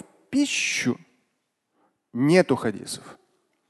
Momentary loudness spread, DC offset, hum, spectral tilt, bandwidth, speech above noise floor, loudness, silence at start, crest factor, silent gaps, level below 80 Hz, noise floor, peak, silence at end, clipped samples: 16 LU; under 0.1%; none; -4.5 dB/octave; 12.5 kHz; 53 dB; -23 LUFS; 0.3 s; 22 dB; none; -68 dBFS; -76 dBFS; -4 dBFS; 0.55 s; under 0.1%